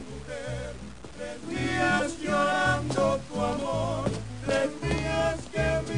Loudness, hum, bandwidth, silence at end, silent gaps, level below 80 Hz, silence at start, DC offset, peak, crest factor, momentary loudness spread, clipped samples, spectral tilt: -28 LUFS; none; 10.5 kHz; 0 s; none; -44 dBFS; 0 s; 0.4%; -12 dBFS; 16 dB; 13 LU; under 0.1%; -5 dB/octave